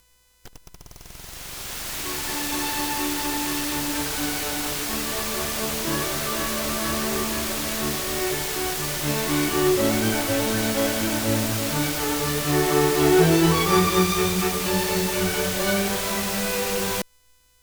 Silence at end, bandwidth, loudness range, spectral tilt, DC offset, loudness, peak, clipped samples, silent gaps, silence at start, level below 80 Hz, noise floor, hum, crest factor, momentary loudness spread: 0.6 s; over 20 kHz; 5 LU; -3.5 dB/octave; under 0.1%; -23 LUFS; -4 dBFS; under 0.1%; none; 0.45 s; -42 dBFS; -60 dBFS; none; 20 dB; 7 LU